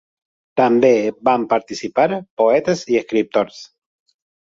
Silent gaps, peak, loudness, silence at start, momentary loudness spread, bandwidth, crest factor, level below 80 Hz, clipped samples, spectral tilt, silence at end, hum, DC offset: 2.30-2.37 s; -2 dBFS; -18 LUFS; 0.55 s; 7 LU; 7.8 kHz; 16 dB; -62 dBFS; under 0.1%; -5.5 dB/octave; 0.9 s; none; under 0.1%